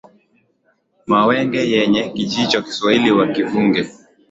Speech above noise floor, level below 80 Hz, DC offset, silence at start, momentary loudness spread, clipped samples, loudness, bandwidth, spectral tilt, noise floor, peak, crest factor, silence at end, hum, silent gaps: 47 dB; -56 dBFS; under 0.1%; 1.1 s; 7 LU; under 0.1%; -16 LUFS; 8 kHz; -5 dB/octave; -63 dBFS; -2 dBFS; 16 dB; 0.4 s; none; none